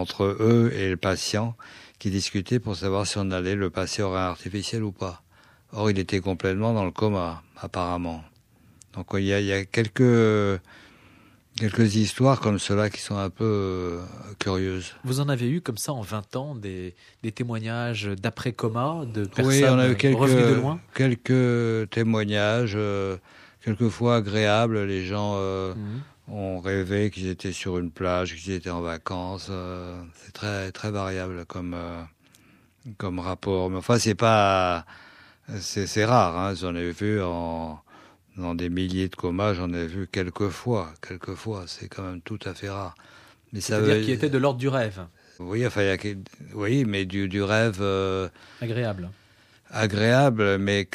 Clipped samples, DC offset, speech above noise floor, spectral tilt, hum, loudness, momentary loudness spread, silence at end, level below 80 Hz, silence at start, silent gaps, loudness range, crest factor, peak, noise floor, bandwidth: under 0.1%; under 0.1%; 33 dB; -6 dB/octave; none; -25 LUFS; 15 LU; 0.1 s; -54 dBFS; 0 s; none; 8 LU; 20 dB; -4 dBFS; -57 dBFS; 14 kHz